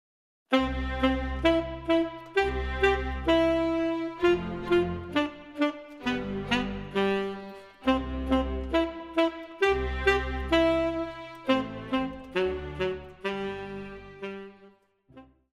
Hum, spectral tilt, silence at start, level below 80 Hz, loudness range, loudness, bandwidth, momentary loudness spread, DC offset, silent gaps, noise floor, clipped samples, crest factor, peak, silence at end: none; -6.5 dB/octave; 0.5 s; -40 dBFS; 5 LU; -28 LUFS; 12 kHz; 10 LU; under 0.1%; none; -59 dBFS; under 0.1%; 18 dB; -10 dBFS; 0.3 s